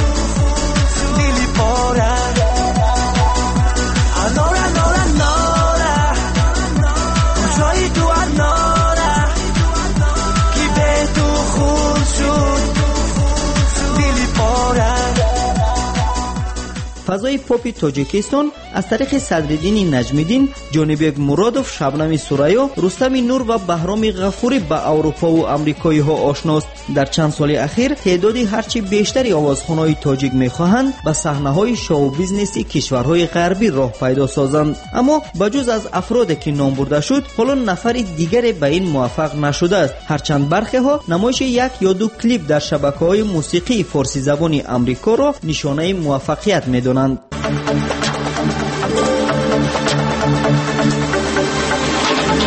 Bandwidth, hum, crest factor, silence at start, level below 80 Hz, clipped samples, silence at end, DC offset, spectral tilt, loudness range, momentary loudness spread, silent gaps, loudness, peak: 8.8 kHz; none; 12 dB; 0 s; -22 dBFS; under 0.1%; 0 s; under 0.1%; -5 dB/octave; 2 LU; 4 LU; none; -16 LUFS; -2 dBFS